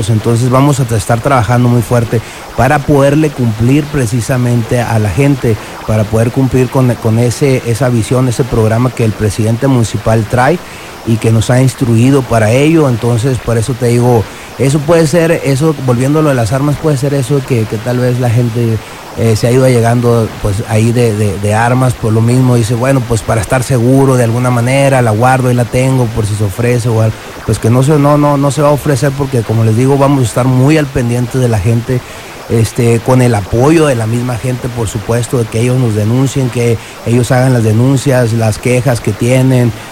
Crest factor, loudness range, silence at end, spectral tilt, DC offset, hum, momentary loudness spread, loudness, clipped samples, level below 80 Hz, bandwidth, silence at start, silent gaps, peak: 10 dB; 2 LU; 0 s; -6.5 dB/octave; under 0.1%; none; 6 LU; -10 LUFS; 0.3%; -32 dBFS; 16 kHz; 0 s; none; 0 dBFS